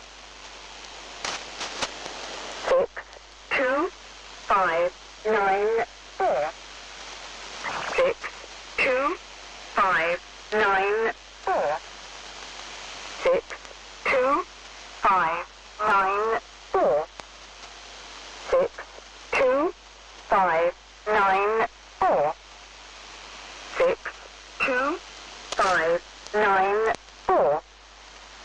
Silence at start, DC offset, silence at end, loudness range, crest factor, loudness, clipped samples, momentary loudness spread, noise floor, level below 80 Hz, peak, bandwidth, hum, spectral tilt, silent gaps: 0 s; under 0.1%; 0 s; 4 LU; 16 dB; -25 LUFS; under 0.1%; 20 LU; -48 dBFS; -54 dBFS; -10 dBFS; 10 kHz; none; -3 dB/octave; none